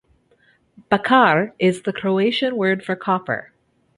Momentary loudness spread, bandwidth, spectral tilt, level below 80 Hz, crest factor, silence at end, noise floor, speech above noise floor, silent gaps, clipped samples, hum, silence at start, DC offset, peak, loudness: 9 LU; 11.5 kHz; -6 dB/octave; -62 dBFS; 18 dB; 0.55 s; -59 dBFS; 40 dB; none; under 0.1%; none; 0.9 s; under 0.1%; -2 dBFS; -19 LUFS